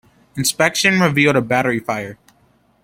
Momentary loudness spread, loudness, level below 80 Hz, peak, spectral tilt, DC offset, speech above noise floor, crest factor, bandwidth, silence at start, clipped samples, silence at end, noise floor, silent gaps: 12 LU; -16 LUFS; -54 dBFS; 0 dBFS; -4 dB/octave; under 0.1%; 40 dB; 18 dB; 16.5 kHz; 0.35 s; under 0.1%; 0.7 s; -57 dBFS; none